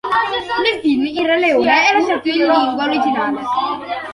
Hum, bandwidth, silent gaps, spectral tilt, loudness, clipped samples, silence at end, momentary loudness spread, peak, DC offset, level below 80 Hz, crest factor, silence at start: none; 11.5 kHz; none; -3.5 dB/octave; -16 LUFS; under 0.1%; 0 s; 7 LU; -2 dBFS; under 0.1%; -58 dBFS; 14 dB; 0.05 s